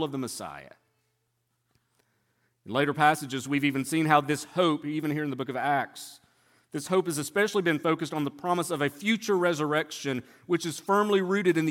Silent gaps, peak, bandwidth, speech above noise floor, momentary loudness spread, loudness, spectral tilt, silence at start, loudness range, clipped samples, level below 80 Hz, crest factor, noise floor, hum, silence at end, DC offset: none; -6 dBFS; 17 kHz; 49 dB; 11 LU; -27 LUFS; -5 dB/octave; 0 s; 3 LU; under 0.1%; -74 dBFS; 22 dB; -76 dBFS; none; 0 s; under 0.1%